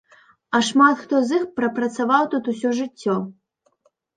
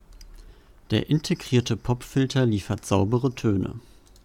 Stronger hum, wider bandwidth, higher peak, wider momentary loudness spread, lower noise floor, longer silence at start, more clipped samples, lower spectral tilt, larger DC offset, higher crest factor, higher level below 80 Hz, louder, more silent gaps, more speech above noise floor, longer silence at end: neither; second, 9.4 kHz vs 16 kHz; first, -2 dBFS vs -6 dBFS; first, 8 LU vs 5 LU; first, -64 dBFS vs -49 dBFS; first, 0.5 s vs 0.1 s; neither; second, -4.5 dB/octave vs -6.5 dB/octave; neither; about the same, 18 dB vs 18 dB; second, -70 dBFS vs -48 dBFS; first, -20 LUFS vs -25 LUFS; neither; first, 44 dB vs 25 dB; first, 0.85 s vs 0.45 s